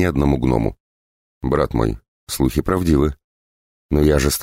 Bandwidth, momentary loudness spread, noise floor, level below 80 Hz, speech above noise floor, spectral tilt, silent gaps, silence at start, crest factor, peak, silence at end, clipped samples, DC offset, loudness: 16 kHz; 9 LU; under -90 dBFS; -28 dBFS; over 73 dB; -6 dB/octave; 0.80-1.41 s, 2.08-2.27 s, 3.24-3.89 s; 0 s; 16 dB; -4 dBFS; 0 s; under 0.1%; under 0.1%; -19 LUFS